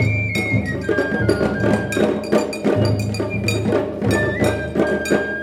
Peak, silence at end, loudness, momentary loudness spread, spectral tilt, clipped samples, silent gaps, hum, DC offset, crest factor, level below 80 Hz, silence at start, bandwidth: -2 dBFS; 0 s; -19 LUFS; 3 LU; -6 dB/octave; under 0.1%; none; none; under 0.1%; 16 dB; -38 dBFS; 0 s; 15.5 kHz